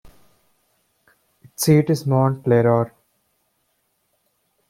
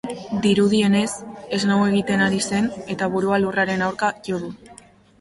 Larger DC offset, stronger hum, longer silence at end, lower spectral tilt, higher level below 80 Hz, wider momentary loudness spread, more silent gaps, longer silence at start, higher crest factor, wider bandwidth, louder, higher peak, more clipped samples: neither; neither; first, 1.85 s vs 0.45 s; first, -6.5 dB/octave vs -5 dB/octave; about the same, -58 dBFS vs -56 dBFS; about the same, 9 LU vs 11 LU; neither; first, 1.6 s vs 0.05 s; first, 20 dB vs 14 dB; first, 16.5 kHz vs 11.5 kHz; first, -18 LUFS vs -21 LUFS; about the same, -4 dBFS vs -6 dBFS; neither